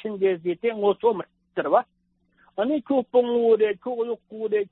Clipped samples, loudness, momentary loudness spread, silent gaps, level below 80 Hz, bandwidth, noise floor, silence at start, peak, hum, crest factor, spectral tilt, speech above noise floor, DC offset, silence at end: under 0.1%; -24 LUFS; 11 LU; none; -72 dBFS; 4.1 kHz; -66 dBFS; 0.05 s; -6 dBFS; none; 18 dB; -10 dB/octave; 43 dB; under 0.1%; 0.1 s